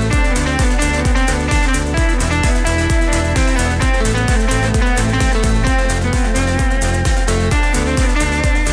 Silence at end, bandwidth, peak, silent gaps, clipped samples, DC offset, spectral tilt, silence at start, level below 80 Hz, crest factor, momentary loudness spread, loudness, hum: 0 s; 11 kHz; -2 dBFS; none; under 0.1%; under 0.1%; -4.5 dB/octave; 0 s; -16 dBFS; 12 dB; 1 LU; -16 LUFS; none